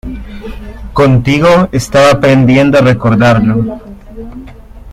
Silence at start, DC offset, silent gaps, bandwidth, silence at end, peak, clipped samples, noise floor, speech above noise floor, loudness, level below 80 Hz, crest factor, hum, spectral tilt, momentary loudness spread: 0.05 s; under 0.1%; none; 15 kHz; 0 s; 0 dBFS; under 0.1%; -30 dBFS; 23 dB; -8 LUFS; -30 dBFS; 10 dB; none; -6.5 dB/octave; 21 LU